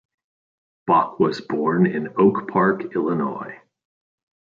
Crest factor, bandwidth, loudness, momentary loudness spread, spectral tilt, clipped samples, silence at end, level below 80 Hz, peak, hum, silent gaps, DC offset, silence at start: 18 dB; 7.2 kHz; -21 LUFS; 10 LU; -8.5 dB/octave; under 0.1%; 0.95 s; -66 dBFS; -4 dBFS; none; none; under 0.1%; 0.85 s